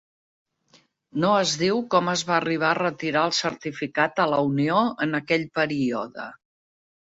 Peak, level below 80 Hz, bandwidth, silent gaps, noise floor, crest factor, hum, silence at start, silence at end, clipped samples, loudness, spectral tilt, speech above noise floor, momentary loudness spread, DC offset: -6 dBFS; -66 dBFS; 8 kHz; none; -61 dBFS; 18 dB; none; 1.15 s; 0.65 s; under 0.1%; -23 LUFS; -4.5 dB/octave; 37 dB; 9 LU; under 0.1%